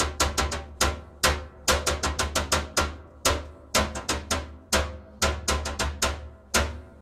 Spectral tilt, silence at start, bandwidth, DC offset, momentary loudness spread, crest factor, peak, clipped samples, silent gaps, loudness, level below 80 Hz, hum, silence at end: -2.5 dB/octave; 0 s; 16 kHz; under 0.1%; 6 LU; 20 dB; -6 dBFS; under 0.1%; none; -27 LUFS; -36 dBFS; none; 0 s